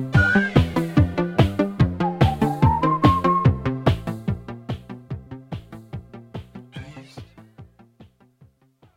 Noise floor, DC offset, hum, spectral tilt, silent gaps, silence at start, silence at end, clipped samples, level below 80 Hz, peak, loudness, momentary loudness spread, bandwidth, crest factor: -58 dBFS; under 0.1%; none; -8 dB/octave; none; 0 s; 0.95 s; under 0.1%; -36 dBFS; 0 dBFS; -20 LUFS; 21 LU; 15.5 kHz; 22 dB